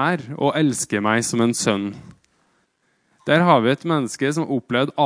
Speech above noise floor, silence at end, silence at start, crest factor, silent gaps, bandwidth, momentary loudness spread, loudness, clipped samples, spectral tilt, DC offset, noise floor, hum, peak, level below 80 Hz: 47 dB; 0 s; 0 s; 20 dB; none; 10.5 kHz; 8 LU; -20 LUFS; under 0.1%; -4.5 dB/octave; under 0.1%; -66 dBFS; none; -2 dBFS; -64 dBFS